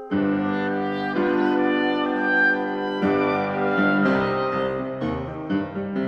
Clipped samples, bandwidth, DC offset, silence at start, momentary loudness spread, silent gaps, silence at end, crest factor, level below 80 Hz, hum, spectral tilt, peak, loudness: under 0.1%; 6.2 kHz; under 0.1%; 0 s; 8 LU; none; 0 s; 14 dB; -52 dBFS; none; -8 dB/octave; -8 dBFS; -22 LUFS